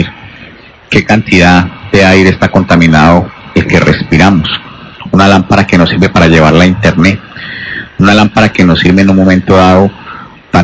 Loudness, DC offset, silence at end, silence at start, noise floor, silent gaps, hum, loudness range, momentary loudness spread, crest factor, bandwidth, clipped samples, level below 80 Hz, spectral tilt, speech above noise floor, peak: -6 LUFS; under 0.1%; 0 s; 0 s; -32 dBFS; none; none; 1 LU; 13 LU; 6 dB; 8 kHz; 8%; -24 dBFS; -6.5 dB/octave; 27 dB; 0 dBFS